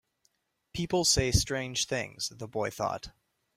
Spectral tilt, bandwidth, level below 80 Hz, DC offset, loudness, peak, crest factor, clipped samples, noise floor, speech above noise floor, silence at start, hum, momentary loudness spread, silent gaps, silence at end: -3 dB/octave; 16 kHz; -44 dBFS; under 0.1%; -29 LUFS; -10 dBFS; 22 dB; under 0.1%; -74 dBFS; 44 dB; 0.75 s; none; 14 LU; none; 0.45 s